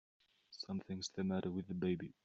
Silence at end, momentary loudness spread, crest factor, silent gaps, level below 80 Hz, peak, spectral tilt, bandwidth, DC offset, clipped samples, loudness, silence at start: 0.15 s; 8 LU; 16 dB; none; -76 dBFS; -26 dBFS; -6 dB/octave; 8 kHz; under 0.1%; under 0.1%; -42 LUFS; 0.5 s